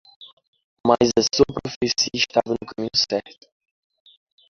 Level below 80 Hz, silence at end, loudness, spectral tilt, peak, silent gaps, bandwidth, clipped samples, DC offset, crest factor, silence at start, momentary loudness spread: -52 dBFS; 1.2 s; -21 LUFS; -3.5 dB/octave; -2 dBFS; 0.33-0.37 s, 0.48-0.53 s, 0.64-0.84 s, 1.76-1.81 s; 7.4 kHz; under 0.1%; under 0.1%; 22 dB; 0.2 s; 9 LU